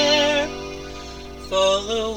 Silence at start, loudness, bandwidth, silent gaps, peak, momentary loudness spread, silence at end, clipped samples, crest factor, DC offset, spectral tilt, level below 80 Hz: 0 s; -20 LUFS; 17 kHz; none; -6 dBFS; 18 LU; 0 s; under 0.1%; 16 dB; 0.3%; -2.5 dB/octave; -42 dBFS